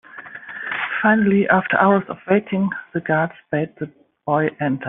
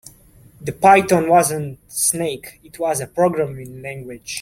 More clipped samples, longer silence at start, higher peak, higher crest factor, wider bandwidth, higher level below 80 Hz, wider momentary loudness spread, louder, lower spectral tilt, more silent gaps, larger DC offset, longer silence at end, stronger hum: neither; second, 0.15 s vs 0.6 s; about the same, -2 dBFS vs -2 dBFS; about the same, 18 dB vs 18 dB; second, 3.8 kHz vs 16.5 kHz; second, -60 dBFS vs -54 dBFS; about the same, 18 LU vs 19 LU; about the same, -19 LUFS vs -17 LUFS; first, -5.5 dB/octave vs -4 dB/octave; neither; neither; about the same, 0 s vs 0 s; neither